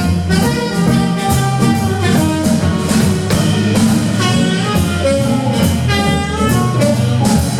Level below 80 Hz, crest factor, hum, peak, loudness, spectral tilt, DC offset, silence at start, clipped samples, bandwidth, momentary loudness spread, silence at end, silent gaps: -30 dBFS; 10 dB; none; -2 dBFS; -14 LUFS; -5.5 dB/octave; under 0.1%; 0 s; under 0.1%; 17.5 kHz; 2 LU; 0 s; none